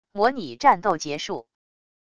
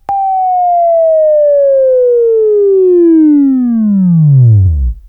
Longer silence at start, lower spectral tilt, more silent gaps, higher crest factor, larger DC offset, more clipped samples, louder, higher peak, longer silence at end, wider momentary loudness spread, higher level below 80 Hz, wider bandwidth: about the same, 0.15 s vs 0.1 s; second, -4 dB/octave vs -14 dB/octave; neither; first, 20 dB vs 8 dB; neither; neither; second, -23 LUFS vs -8 LUFS; second, -4 dBFS vs 0 dBFS; first, 0.75 s vs 0.1 s; first, 12 LU vs 4 LU; second, -60 dBFS vs -24 dBFS; first, 10.5 kHz vs 2.5 kHz